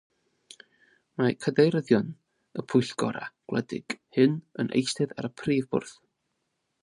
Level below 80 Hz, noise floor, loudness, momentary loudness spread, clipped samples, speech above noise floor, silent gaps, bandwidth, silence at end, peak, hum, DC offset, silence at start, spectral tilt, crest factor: -68 dBFS; -79 dBFS; -27 LUFS; 15 LU; under 0.1%; 52 dB; none; 11.5 kHz; 0.9 s; -8 dBFS; none; under 0.1%; 1.2 s; -6 dB/octave; 20 dB